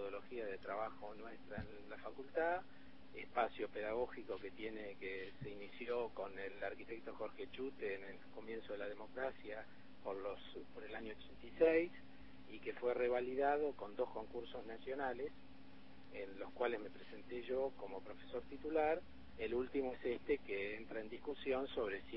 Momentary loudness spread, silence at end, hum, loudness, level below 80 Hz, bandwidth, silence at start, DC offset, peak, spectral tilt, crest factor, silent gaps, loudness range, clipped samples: 15 LU; 0 s; none; -44 LUFS; -68 dBFS; 5.6 kHz; 0 s; 0.2%; -22 dBFS; -3.5 dB/octave; 24 dB; none; 8 LU; under 0.1%